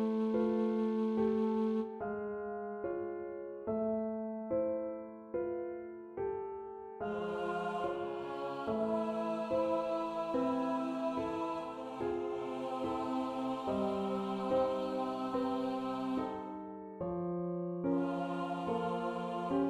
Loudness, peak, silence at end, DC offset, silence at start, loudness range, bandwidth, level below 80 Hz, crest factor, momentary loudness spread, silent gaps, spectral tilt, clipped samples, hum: -37 LUFS; -22 dBFS; 0 s; under 0.1%; 0 s; 4 LU; 10 kHz; -68 dBFS; 14 dB; 9 LU; none; -7.5 dB/octave; under 0.1%; none